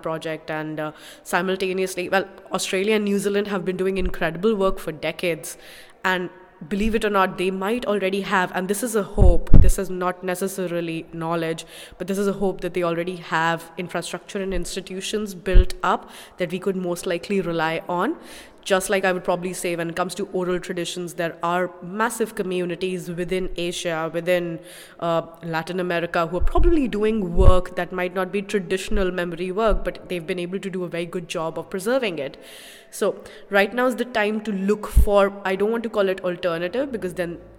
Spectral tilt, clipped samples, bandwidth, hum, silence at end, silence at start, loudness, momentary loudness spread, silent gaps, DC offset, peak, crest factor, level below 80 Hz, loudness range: -5.5 dB/octave; under 0.1%; 16.5 kHz; none; 0.1 s; 0.05 s; -24 LUFS; 9 LU; none; under 0.1%; 0 dBFS; 22 dB; -28 dBFS; 4 LU